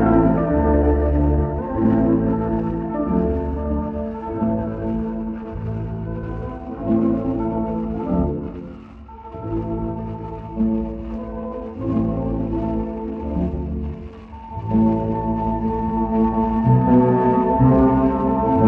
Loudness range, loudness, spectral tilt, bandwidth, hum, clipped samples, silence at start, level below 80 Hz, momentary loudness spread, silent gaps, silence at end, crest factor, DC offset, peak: 8 LU; -21 LUFS; -12 dB/octave; 3.9 kHz; none; under 0.1%; 0 s; -30 dBFS; 14 LU; none; 0 s; 16 dB; under 0.1%; -4 dBFS